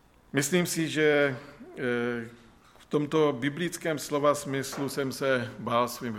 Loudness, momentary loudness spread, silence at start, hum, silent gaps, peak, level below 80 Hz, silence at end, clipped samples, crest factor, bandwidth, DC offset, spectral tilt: -28 LUFS; 8 LU; 0.35 s; none; none; -10 dBFS; -64 dBFS; 0 s; under 0.1%; 18 dB; 17 kHz; under 0.1%; -4.5 dB/octave